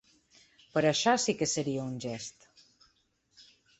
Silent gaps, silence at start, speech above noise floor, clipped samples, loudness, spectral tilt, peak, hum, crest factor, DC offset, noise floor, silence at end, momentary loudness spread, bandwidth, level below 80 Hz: none; 0.75 s; 42 dB; under 0.1%; -30 LUFS; -3.5 dB/octave; -12 dBFS; none; 20 dB; under 0.1%; -72 dBFS; 0.4 s; 13 LU; 8.4 kHz; -70 dBFS